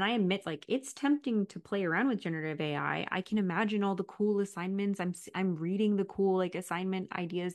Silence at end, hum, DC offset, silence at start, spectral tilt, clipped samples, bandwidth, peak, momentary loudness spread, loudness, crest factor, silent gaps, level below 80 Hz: 0 s; none; under 0.1%; 0 s; -6 dB/octave; under 0.1%; 12.5 kHz; -16 dBFS; 5 LU; -33 LUFS; 16 dB; none; -76 dBFS